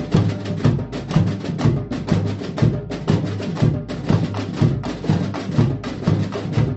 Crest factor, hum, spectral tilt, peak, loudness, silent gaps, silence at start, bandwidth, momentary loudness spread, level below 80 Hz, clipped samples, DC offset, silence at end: 18 dB; none; -8 dB/octave; -2 dBFS; -21 LUFS; none; 0 s; 8.2 kHz; 4 LU; -38 dBFS; under 0.1%; under 0.1%; 0 s